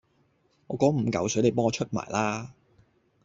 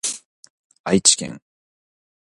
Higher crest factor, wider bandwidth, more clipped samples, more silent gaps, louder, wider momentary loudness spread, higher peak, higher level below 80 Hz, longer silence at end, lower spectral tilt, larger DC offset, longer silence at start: about the same, 20 dB vs 22 dB; second, 8 kHz vs 11.5 kHz; neither; second, none vs 0.25-0.43 s, 0.50-0.70 s, 0.79-0.84 s; second, -27 LUFS vs -17 LUFS; second, 12 LU vs 19 LU; second, -8 dBFS vs -2 dBFS; about the same, -62 dBFS vs -58 dBFS; about the same, 0.75 s vs 0.85 s; first, -5.5 dB/octave vs -2.5 dB/octave; neither; first, 0.7 s vs 0.05 s